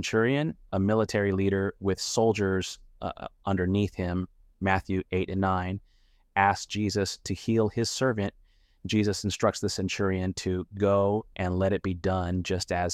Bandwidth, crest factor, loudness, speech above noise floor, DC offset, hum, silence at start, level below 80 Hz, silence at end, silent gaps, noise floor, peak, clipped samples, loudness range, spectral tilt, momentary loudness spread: 14 kHz; 20 dB; -28 LUFS; 35 dB; under 0.1%; none; 0 s; -52 dBFS; 0 s; none; -62 dBFS; -8 dBFS; under 0.1%; 2 LU; -5.5 dB/octave; 8 LU